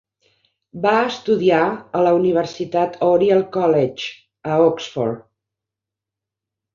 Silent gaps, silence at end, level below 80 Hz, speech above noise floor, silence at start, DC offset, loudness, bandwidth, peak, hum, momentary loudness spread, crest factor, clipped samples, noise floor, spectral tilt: none; 1.55 s; -62 dBFS; 68 dB; 0.75 s; under 0.1%; -18 LUFS; 7.4 kHz; -2 dBFS; none; 9 LU; 16 dB; under 0.1%; -86 dBFS; -6.5 dB/octave